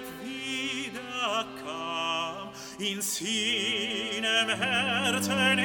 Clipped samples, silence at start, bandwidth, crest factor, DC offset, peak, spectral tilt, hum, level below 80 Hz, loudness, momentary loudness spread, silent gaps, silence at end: under 0.1%; 0 s; 19 kHz; 20 dB; under 0.1%; -10 dBFS; -2 dB/octave; none; -68 dBFS; -28 LUFS; 11 LU; none; 0 s